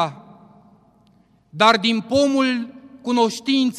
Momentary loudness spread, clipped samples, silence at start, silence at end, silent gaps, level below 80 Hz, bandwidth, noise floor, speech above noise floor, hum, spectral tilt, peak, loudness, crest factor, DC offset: 16 LU; under 0.1%; 0 s; 0 s; none; -62 dBFS; 12.5 kHz; -57 dBFS; 39 dB; none; -4 dB/octave; -2 dBFS; -19 LUFS; 18 dB; under 0.1%